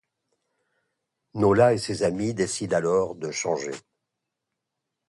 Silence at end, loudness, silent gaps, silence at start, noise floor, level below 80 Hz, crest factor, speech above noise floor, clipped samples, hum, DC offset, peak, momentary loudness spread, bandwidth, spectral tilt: 1.3 s; -24 LUFS; none; 1.35 s; -83 dBFS; -56 dBFS; 20 dB; 60 dB; under 0.1%; none; under 0.1%; -6 dBFS; 12 LU; 11.5 kHz; -5 dB/octave